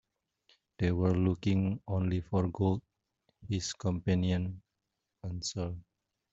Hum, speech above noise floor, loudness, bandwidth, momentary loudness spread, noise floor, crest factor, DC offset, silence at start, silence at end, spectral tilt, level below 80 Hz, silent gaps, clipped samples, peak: none; 54 dB; -33 LUFS; 8 kHz; 11 LU; -85 dBFS; 18 dB; under 0.1%; 0.8 s; 0.5 s; -7 dB/octave; -58 dBFS; none; under 0.1%; -16 dBFS